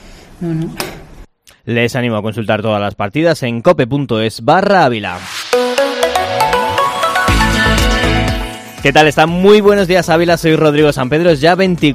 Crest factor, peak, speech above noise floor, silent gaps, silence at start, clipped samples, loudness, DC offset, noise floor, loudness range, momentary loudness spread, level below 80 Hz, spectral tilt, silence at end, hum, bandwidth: 12 dB; 0 dBFS; 28 dB; none; 0.05 s; 0.3%; -12 LUFS; under 0.1%; -39 dBFS; 5 LU; 11 LU; -28 dBFS; -5 dB/octave; 0 s; none; 16 kHz